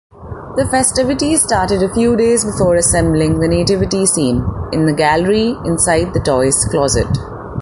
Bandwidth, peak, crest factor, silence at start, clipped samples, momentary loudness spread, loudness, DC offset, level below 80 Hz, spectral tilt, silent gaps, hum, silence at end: 12 kHz; 0 dBFS; 14 dB; 0.15 s; under 0.1%; 7 LU; -14 LUFS; under 0.1%; -30 dBFS; -4.5 dB/octave; none; none; 0 s